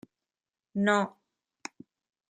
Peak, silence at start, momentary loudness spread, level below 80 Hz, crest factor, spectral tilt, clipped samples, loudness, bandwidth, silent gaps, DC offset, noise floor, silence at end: -10 dBFS; 0.75 s; 19 LU; -76 dBFS; 24 dB; -5.5 dB/octave; under 0.1%; -29 LUFS; 9.4 kHz; none; under 0.1%; under -90 dBFS; 1.2 s